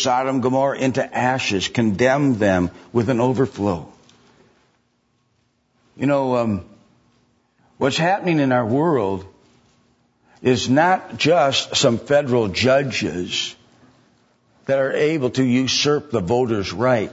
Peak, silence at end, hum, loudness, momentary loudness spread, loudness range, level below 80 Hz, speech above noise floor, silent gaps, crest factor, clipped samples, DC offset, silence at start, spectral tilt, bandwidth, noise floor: -2 dBFS; 0 s; none; -19 LUFS; 7 LU; 8 LU; -54 dBFS; 47 dB; none; 18 dB; under 0.1%; under 0.1%; 0 s; -5 dB/octave; 8 kHz; -66 dBFS